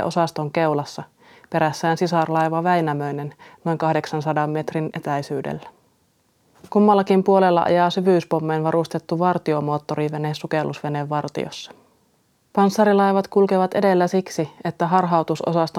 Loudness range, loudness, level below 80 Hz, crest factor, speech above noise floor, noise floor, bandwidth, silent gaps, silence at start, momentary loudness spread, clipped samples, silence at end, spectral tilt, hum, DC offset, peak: 6 LU; -21 LUFS; -68 dBFS; 18 dB; 43 dB; -63 dBFS; 14 kHz; none; 0 s; 11 LU; under 0.1%; 0 s; -6.5 dB/octave; none; under 0.1%; -2 dBFS